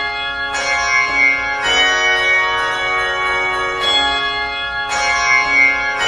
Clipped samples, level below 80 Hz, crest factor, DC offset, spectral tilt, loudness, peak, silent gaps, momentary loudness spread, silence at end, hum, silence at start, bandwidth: under 0.1%; -42 dBFS; 14 dB; under 0.1%; -0.5 dB/octave; -14 LUFS; -2 dBFS; none; 8 LU; 0 s; none; 0 s; 12 kHz